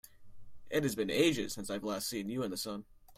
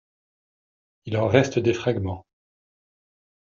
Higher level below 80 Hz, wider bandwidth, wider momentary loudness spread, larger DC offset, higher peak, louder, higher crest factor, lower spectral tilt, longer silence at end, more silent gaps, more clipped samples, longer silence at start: about the same, -62 dBFS vs -62 dBFS; first, 16 kHz vs 7.4 kHz; second, 9 LU vs 16 LU; neither; second, -14 dBFS vs -4 dBFS; second, -35 LUFS vs -23 LUFS; about the same, 20 dB vs 24 dB; second, -4 dB/octave vs -6 dB/octave; second, 0.05 s vs 1.3 s; neither; neither; second, 0.05 s vs 1.05 s